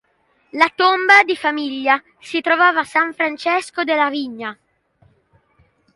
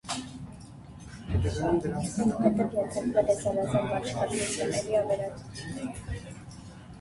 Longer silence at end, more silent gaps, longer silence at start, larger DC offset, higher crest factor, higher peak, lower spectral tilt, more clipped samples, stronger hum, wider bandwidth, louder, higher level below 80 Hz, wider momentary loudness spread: first, 1.4 s vs 0 s; neither; first, 0.55 s vs 0.05 s; neither; about the same, 18 dB vs 20 dB; first, 0 dBFS vs -10 dBFS; second, -2.5 dB/octave vs -5.5 dB/octave; neither; neither; about the same, 11.5 kHz vs 11.5 kHz; first, -16 LUFS vs -29 LUFS; second, -68 dBFS vs -46 dBFS; second, 14 LU vs 19 LU